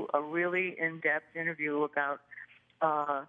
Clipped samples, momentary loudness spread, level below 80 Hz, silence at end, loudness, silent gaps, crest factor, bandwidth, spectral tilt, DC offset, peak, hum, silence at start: under 0.1%; 7 LU; -88 dBFS; 0.05 s; -32 LUFS; none; 20 dB; 6.8 kHz; -8 dB/octave; under 0.1%; -14 dBFS; none; 0 s